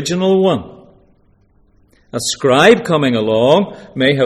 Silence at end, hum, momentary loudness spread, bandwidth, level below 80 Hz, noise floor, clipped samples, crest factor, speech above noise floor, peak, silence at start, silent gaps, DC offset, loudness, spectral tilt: 0 s; none; 12 LU; 15 kHz; -50 dBFS; -53 dBFS; under 0.1%; 14 dB; 40 dB; 0 dBFS; 0 s; none; under 0.1%; -13 LUFS; -5 dB/octave